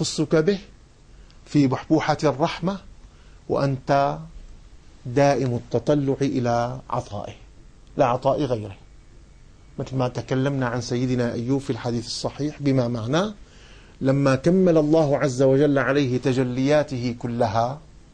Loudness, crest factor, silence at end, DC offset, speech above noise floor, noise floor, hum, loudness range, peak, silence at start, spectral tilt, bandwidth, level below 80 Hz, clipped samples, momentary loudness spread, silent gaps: -22 LUFS; 16 dB; 0.3 s; under 0.1%; 27 dB; -48 dBFS; none; 6 LU; -6 dBFS; 0 s; -6.5 dB/octave; 9.8 kHz; -48 dBFS; under 0.1%; 11 LU; none